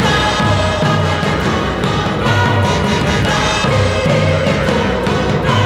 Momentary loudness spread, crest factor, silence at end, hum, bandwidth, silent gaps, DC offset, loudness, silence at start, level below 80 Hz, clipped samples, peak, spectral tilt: 3 LU; 14 dB; 0 s; none; 13.5 kHz; none; under 0.1%; -14 LUFS; 0 s; -28 dBFS; under 0.1%; 0 dBFS; -5.5 dB/octave